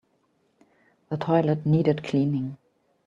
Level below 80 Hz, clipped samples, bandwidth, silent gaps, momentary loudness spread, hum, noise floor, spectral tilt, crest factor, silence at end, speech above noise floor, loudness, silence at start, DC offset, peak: -66 dBFS; under 0.1%; 7.4 kHz; none; 11 LU; none; -69 dBFS; -9 dB/octave; 20 dB; 0.5 s; 45 dB; -25 LUFS; 1.1 s; under 0.1%; -8 dBFS